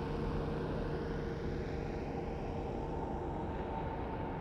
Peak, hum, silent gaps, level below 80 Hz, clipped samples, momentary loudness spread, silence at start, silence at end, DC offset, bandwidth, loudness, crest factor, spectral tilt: -24 dBFS; none; none; -46 dBFS; under 0.1%; 2 LU; 0 s; 0 s; under 0.1%; 9.8 kHz; -40 LUFS; 14 dB; -8.5 dB/octave